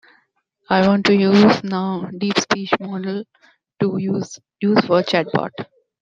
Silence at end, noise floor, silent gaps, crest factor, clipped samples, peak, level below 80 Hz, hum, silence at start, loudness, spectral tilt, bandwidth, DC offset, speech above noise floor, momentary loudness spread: 0.4 s; -65 dBFS; none; 16 dB; under 0.1%; -2 dBFS; -58 dBFS; none; 0.7 s; -18 LUFS; -5.5 dB/octave; 7.6 kHz; under 0.1%; 47 dB; 14 LU